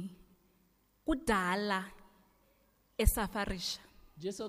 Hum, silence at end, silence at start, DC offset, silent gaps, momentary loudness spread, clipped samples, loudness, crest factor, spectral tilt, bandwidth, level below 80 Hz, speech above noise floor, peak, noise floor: 50 Hz at -60 dBFS; 0 s; 0 s; under 0.1%; none; 13 LU; under 0.1%; -35 LUFS; 22 dB; -4 dB/octave; 15.5 kHz; -42 dBFS; 38 dB; -14 dBFS; -71 dBFS